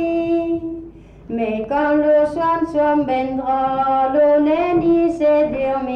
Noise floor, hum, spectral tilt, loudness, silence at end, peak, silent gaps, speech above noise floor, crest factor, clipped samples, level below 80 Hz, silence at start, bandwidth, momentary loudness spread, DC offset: -38 dBFS; none; -7.5 dB/octave; -17 LUFS; 0 s; -8 dBFS; none; 21 dB; 10 dB; under 0.1%; -46 dBFS; 0 s; 6.8 kHz; 8 LU; under 0.1%